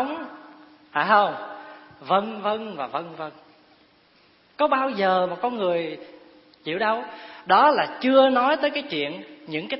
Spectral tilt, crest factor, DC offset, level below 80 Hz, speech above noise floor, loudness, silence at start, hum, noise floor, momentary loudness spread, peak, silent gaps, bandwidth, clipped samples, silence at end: -9 dB/octave; 20 dB; under 0.1%; -72 dBFS; 36 dB; -22 LUFS; 0 s; none; -58 dBFS; 20 LU; -4 dBFS; none; 5.8 kHz; under 0.1%; 0 s